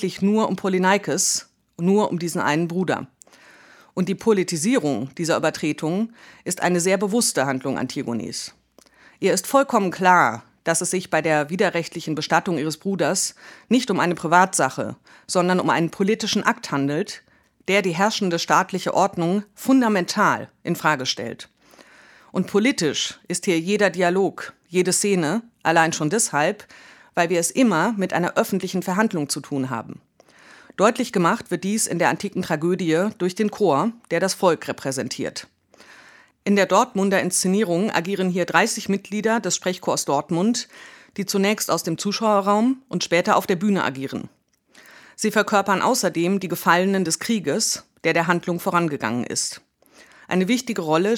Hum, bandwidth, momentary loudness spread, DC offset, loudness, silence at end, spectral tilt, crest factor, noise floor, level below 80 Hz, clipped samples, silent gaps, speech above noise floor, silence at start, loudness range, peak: none; 18.5 kHz; 9 LU; under 0.1%; -21 LUFS; 0 s; -4 dB/octave; 22 dB; -54 dBFS; -68 dBFS; under 0.1%; none; 33 dB; 0 s; 3 LU; 0 dBFS